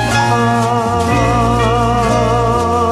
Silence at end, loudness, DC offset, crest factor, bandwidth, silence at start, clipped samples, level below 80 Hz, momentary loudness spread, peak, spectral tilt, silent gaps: 0 s; -13 LUFS; under 0.1%; 12 dB; 13.5 kHz; 0 s; under 0.1%; -26 dBFS; 1 LU; -2 dBFS; -5.5 dB/octave; none